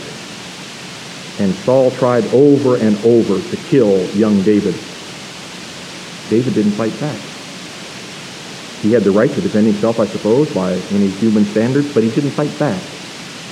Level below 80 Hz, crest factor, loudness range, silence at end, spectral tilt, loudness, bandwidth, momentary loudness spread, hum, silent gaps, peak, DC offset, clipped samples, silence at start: -58 dBFS; 16 dB; 8 LU; 0 s; -6.5 dB/octave; -15 LUFS; 13 kHz; 16 LU; none; none; 0 dBFS; under 0.1%; under 0.1%; 0 s